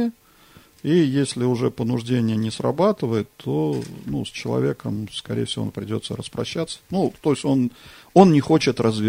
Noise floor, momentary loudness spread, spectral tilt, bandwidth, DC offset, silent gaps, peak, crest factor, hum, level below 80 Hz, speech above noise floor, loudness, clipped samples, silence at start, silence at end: -51 dBFS; 11 LU; -6.5 dB/octave; 16 kHz; under 0.1%; none; 0 dBFS; 22 dB; none; -54 dBFS; 30 dB; -22 LUFS; under 0.1%; 0 s; 0 s